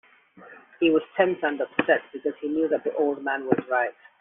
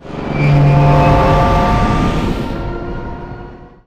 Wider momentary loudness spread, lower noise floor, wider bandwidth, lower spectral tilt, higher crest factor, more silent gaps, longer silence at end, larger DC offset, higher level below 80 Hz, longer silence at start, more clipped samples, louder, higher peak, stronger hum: second, 6 LU vs 17 LU; first, -50 dBFS vs -33 dBFS; second, 3.8 kHz vs 8.8 kHz; second, -3.5 dB/octave vs -8 dB/octave; first, 22 dB vs 14 dB; neither; about the same, 0.3 s vs 0.2 s; neither; second, -70 dBFS vs -22 dBFS; first, 0.35 s vs 0.05 s; neither; second, -25 LUFS vs -13 LUFS; second, -4 dBFS vs 0 dBFS; neither